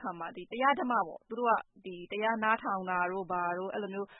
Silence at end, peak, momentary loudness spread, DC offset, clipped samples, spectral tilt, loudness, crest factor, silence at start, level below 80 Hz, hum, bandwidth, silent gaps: 0 s; -14 dBFS; 11 LU; under 0.1%; under 0.1%; 0.5 dB/octave; -32 LUFS; 18 dB; 0 s; -74 dBFS; none; 3.9 kHz; none